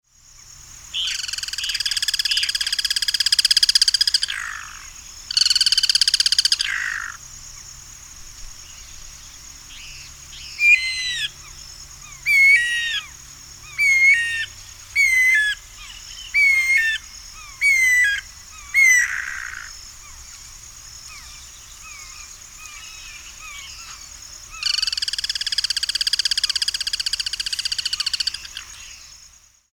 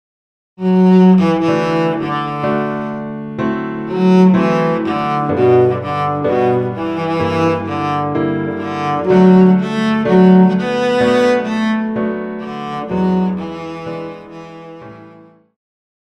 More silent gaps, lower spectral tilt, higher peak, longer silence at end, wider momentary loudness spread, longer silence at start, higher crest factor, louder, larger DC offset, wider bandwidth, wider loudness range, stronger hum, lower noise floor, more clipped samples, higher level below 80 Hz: neither; second, 3 dB/octave vs -8 dB/octave; about the same, 0 dBFS vs 0 dBFS; second, 0.65 s vs 0.95 s; first, 24 LU vs 16 LU; about the same, 0.6 s vs 0.6 s; first, 22 dB vs 14 dB; second, -17 LUFS vs -14 LUFS; neither; first, over 20 kHz vs 8.2 kHz; first, 19 LU vs 9 LU; neither; first, -50 dBFS vs -43 dBFS; neither; about the same, -48 dBFS vs -52 dBFS